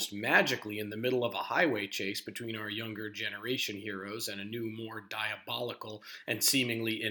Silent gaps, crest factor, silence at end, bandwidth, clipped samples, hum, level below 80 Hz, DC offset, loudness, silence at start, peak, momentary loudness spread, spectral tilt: none; 24 dB; 0 s; over 20 kHz; under 0.1%; none; -84 dBFS; under 0.1%; -32 LUFS; 0 s; -10 dBFS; 13 LU; -3 dB/octave